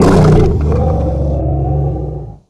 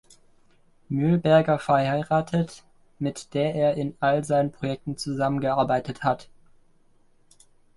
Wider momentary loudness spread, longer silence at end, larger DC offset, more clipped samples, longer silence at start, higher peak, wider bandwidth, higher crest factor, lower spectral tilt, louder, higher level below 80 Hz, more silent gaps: about the same, 10 LU vs 11 LU; second, 0.15 s vs 1.55 s; neither; neither; second, 0 s vs 0.9 s; first, 0 dBFS vs -6 dBFS; about the same, 11 kHz vs 11.5 kHz; second, 12 dB vs 20 dB; first, -8.5 dB/octave vs -7 dB/octave; first, -13 LUFS vs -24 LUFS; first, -18 dBFS vs -56 dBFS; neither